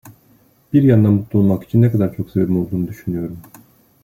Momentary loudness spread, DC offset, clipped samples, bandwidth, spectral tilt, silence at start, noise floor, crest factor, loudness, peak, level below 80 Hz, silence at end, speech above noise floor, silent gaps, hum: 12 LU; under 0.1%; under 0.1%; 15.5 kHz; -10.5 dB/octave; 0.05 s; -54 dBFS; 16 dB; -17 LUFS; -2 dBFS; -50 dBFS; 0.6 s; 38 dB; none; none